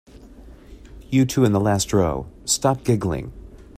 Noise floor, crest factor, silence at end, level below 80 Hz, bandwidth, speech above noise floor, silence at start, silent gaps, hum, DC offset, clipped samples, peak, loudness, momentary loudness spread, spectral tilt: -43 dBFS; 18 dB; 0.15 s; -42 dBFS; 15.5 kHz; 23 dB; 0.15 s; none; none; under 0.1%; under 0.1%; -4 dBFS; -21 LUFS; 10 LU; -5.5 dB/octave